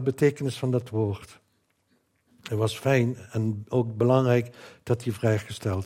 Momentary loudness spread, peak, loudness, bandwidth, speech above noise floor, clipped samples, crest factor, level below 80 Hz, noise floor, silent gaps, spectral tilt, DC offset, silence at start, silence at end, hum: 10 LU; -8 dBFS; -26 LUFS; 15.5 kHz; 45 dB; under 0.1%; 18 dB; -64 dBFS; -70 dBFS; none; -7 dB/octave; under 0.1%; 0 s; 0 s; none